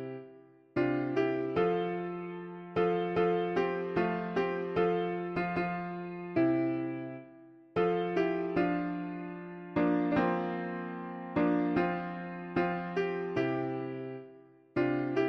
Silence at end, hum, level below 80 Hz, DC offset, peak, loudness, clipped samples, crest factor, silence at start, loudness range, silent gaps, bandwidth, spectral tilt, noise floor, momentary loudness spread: 0 s; none; -64 dBFS; under 0.1%; -16 dBFS; -32 LUFS; under 0.1%; 16 dB; 0 s; 2 LU; none; 6.2 kHz; -8.5 dB/octave; -56 dBFS; 11 LU